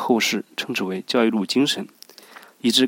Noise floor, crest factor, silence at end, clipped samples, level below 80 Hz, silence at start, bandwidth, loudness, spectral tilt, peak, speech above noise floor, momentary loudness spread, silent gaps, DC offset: -46 dBFS; 18 dB; 0 s; under 0.1%; -76 dBFS; 0 s; 17 kHz; -22 LUFS; -3.5 dB/octave; -4 dBFS; 24 dB; 8 LU; none; under 0.1%